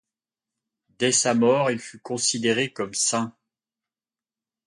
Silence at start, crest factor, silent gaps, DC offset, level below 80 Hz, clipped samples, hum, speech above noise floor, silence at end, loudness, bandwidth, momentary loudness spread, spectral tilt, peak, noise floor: 1 s; 18 dB; none; under 0.1%; -70 dBFS; under 0.1%; none; over 67 dB; 1.35 s; -23 LUFS; 11.5 kHz; 11 LU; -3 dB/octave; -8 dBFS; under -90 dBFS